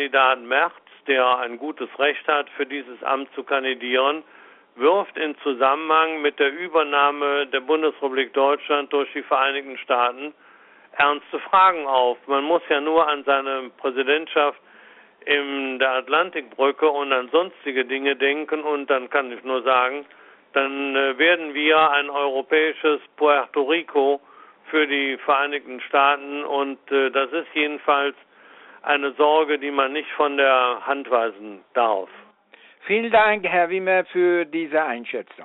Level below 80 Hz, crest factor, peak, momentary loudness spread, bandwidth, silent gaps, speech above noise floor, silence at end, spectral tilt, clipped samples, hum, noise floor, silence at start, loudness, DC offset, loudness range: -70 dBFS; 18 dB; -4 dBFS; 9 LU; 4.1 kHz; none; 31 dB; 0 s; 0.5 dB/octave; under 0.1%; none; -52 dBFS; 0 s; -21 LUFS; under 0.1%; 3 LU